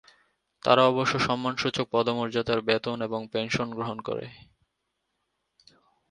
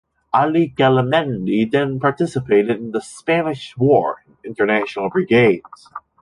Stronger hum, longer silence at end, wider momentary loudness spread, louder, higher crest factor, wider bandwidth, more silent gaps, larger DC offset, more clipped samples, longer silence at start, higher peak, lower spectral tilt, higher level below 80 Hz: neither; first, 1.75 s vs 0.25 s; about the same, 12 LU vs 11 LU; second, -26 LUFS vs -18 LUFS; first, 24 dB vs 16 dB; about the same, 10.5 kHz vs 11.5 kHz; neither; neither; neither; first, 0.65 s vs 0.35 s; about the same, -4 dBFS vs -2 dBFS; second, -5 dB/octave vs -7 dB/octave; about the same, -60 dBFS vs -56 dBFS